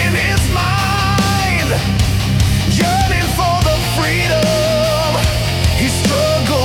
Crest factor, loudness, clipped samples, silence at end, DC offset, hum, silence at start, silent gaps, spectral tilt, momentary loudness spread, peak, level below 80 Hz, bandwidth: 12 dB; -14 LUFS; under 0.1%; 0 s; under 0.1%; none; 0 s; none; -4.5 dB/octave; 2 LU; -2 dBFS; -24 dBFS; 18 kHz